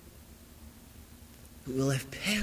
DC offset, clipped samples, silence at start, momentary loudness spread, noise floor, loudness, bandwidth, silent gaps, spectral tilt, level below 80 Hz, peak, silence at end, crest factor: under 0.1%; under 0.1%; 0 s; 22 LU; -53 dBFS; -32 LUFS; 16 kHz; none; -4.5 dB/octave; -56 dBFS; -18 dBFS; 0 s; 18 dB